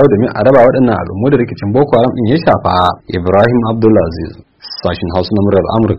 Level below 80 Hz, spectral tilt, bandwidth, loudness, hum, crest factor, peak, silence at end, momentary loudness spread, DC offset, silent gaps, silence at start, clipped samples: -36 dBFS; -9.5 dB/octave; 6.2 kHz; -11 LUFS; none; 10 dB; 0 dBFS; 0 s; 10 LU; under 0.1%; none; 0 s; 0.4%